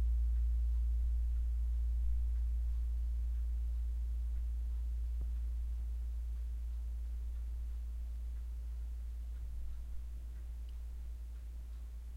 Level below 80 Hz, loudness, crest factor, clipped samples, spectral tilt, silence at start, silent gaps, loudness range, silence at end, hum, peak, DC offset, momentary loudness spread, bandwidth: -38 dBFS; -41 LUFS; 10 dB; under 0.1%; -7 dB/octave; 0 s; none; 8 LU; 0 s; none; -26 dBFS; under 0.1%; 11 LU; 1.7 kHz